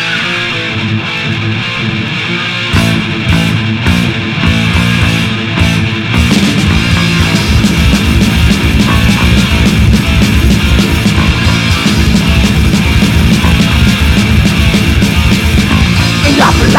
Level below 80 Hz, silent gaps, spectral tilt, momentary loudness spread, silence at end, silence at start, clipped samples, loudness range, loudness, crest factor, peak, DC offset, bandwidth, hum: -16 dBFS; none; -5 dB/octave; 5 LU; 0 s; 0 s; 0.5%; 3 LU; -9 LUFS; 8 dB; 0 dBFS; under 0.1%; 17 kHz; none